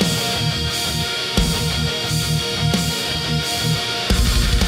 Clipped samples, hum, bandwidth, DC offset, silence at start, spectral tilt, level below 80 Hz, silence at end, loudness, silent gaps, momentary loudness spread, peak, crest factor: under 0.1%; none; 16 kHz; under 0.1%; 0 s; -3.5 dB/octave; -26 dBFS; 0 s; -19 LUFS; none; 2 LU; -2 dBFS; 18 dB